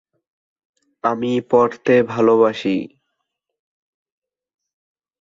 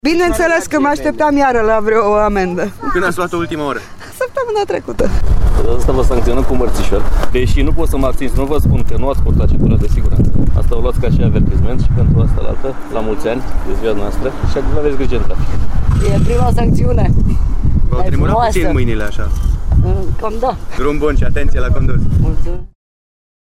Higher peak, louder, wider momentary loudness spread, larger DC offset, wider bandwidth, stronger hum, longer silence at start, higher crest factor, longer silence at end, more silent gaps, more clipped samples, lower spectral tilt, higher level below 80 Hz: about the same, -2 dBFS vs -2 dBFS; about the same, -17 LUFS vs -15 LUFS; about the same, 9 LU vs 7 LU; neither; second, 7.4 kHz vs 13 kHz; neither; first, 1.05 s vs 0.05 s; first, 18 dB vs 8 dB; first, 2.35 s vs 0.8 s; neither; neither; about the same, -7 dB/octave vs -7 dB/octave; second, -62 dBFS vs -16 dBFS